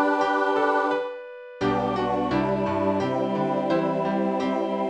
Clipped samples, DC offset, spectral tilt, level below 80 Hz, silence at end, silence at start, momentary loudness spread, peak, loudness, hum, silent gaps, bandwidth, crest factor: under 0.1%; under 0.1%; -7 dB/octave; -54 dBFS; 0 s; 0 s; 6 LU; -8 dBFS; -24 LUFS; none; none; 9.6 kHz; 16 dB